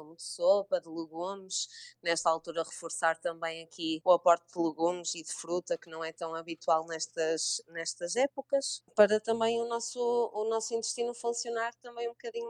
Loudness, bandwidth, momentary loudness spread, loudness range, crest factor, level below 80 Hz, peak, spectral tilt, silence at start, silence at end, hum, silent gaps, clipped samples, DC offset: -32 LUFS; 12 kHz; 11 LU; 3 LU; 22 dB; -82 dBFS; -10 dBFS; -2 dB/octave; 0 s; 0 s; none; none; under 0.1%; under 0.1%